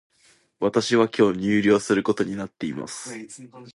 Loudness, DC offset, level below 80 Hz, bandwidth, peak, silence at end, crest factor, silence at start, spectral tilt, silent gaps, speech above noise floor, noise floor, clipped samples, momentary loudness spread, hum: -22 LUFS; under 0.1%; -60 dBFS; 11.5 kHz; -6 dBFS; 0.05 s; 18 dB; 0.6 s; -5 dB/octave; none; 38 dB; -60 dBFS; under 0.1%; 16 LU; none